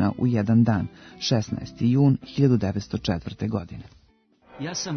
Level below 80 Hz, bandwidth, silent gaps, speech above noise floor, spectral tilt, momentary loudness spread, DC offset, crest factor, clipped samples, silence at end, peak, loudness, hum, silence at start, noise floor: -52 dBFS; 6.6 kHz; none; 37 dB; -6.5 dB/octave; 12 LU; under 0.1%; 16 dB; under 0.1%; 0 s; -8 dBFS; -24 LUFS; none; 0 s; -61 dBFS